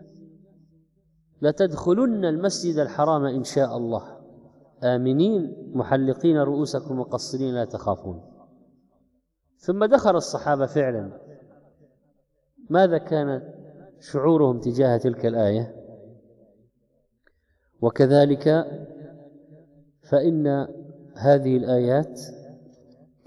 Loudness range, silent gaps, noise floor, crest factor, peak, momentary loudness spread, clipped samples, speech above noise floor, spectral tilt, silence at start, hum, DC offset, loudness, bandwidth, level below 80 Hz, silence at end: 4 LU; none; -70 dBFS; 20 dB; -4 dBFS; 15 LU; under 0.1%; 48 dB; -7 dB/octave; 1.4 s; none; under 0.1%; -23 LUFS; 12 kHz; -62 dBFS; 0.7 s